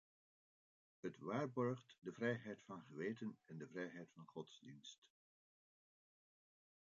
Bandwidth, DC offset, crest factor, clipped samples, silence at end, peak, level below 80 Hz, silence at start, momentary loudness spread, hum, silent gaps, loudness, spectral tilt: 7.4 kHz; under 0.1%; 22 dB; under 0.1%; 1.85 s; -28 dBFS; under -90 dBFS; 1.05 s; 14 LU; none; 4.98-5.02 s; -49 LUFS; -5.5 dB/octave